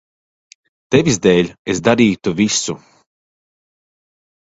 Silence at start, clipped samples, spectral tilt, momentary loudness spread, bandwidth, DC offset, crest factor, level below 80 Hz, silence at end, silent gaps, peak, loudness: 0.9 s; under 0.1%; -4.5 dB/octave; 7 LU; 8 kHz; under 0.1%; 18 dB; -48 dBFS; 1.8 s; 1.59-1.65 s; 0 dBFS; -15 LUFS